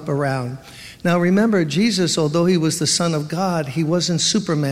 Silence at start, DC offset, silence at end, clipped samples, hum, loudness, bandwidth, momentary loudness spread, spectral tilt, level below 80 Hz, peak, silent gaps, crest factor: 0 s; under 0.1%; 0 s; under 0.1%; none; -18 LUFS; 15.5 kHz; 8 LU; -4.5 dB/octave; -56 dBFS; -4 dBFS; none; 14 dB